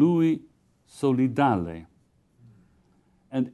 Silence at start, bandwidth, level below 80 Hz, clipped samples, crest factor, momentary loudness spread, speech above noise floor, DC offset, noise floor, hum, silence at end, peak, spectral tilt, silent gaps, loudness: 0 s; 12 kHz; -56 dBFS; under 0.1%; 18 dB; 12 LU; 41 dB; under 0.1%; -64 dBFS; none; 0.05 s; -8 dBFS; -8.5 dB/octave; none; -25 LUFS